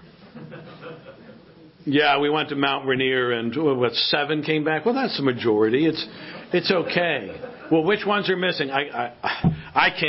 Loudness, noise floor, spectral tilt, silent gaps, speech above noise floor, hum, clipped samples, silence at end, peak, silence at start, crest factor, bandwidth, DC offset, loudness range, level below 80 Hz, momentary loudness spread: -22 LUFS; -48 dBFS; -9.5 dB/octave; none; 26 dB; none; under 0.1%; 0 s; -2 dBFS; 0.05 s; 20 dB; 5.8 kHz; under 0.1%; 2 LU; -54 dBFS; 18 LU